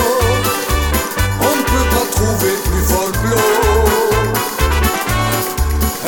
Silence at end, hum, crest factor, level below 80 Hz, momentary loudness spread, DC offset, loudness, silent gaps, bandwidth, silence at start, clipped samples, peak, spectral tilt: 0 s; none; 14 dB; -20 dBFS; 4 LU; under 0.1%; -15 LUFS; none; 19.5 kHz; 0 s; under 0.1%; -2 dBFS; -4 dB/octave